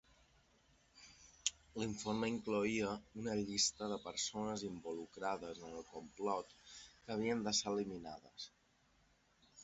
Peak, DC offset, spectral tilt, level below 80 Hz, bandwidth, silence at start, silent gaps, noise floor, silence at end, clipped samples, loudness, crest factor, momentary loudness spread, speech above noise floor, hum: -18 dBFS; under 0.1%; -3.5 dB/octave; -70 dBFS; 8 kHz; 0.95 s; none; -74 dBFS; 0 s; under 0.1%; -41 LUFS; 26 dB; 18 LU; 32 dB; none